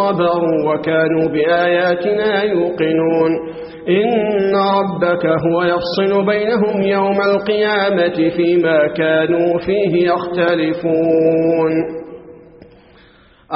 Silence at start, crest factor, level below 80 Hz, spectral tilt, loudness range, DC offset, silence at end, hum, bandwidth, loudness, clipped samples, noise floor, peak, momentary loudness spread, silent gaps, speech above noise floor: 0 s; 14 dB; -52 dBFS; -4.5 dB/octave; 1 LU; under 0.1%; 0 s; none; 5.8 kHz; -15 LUFS; under 0.1%; -47 dBFS; -2 dBFS; 3 LU; none; 33 dB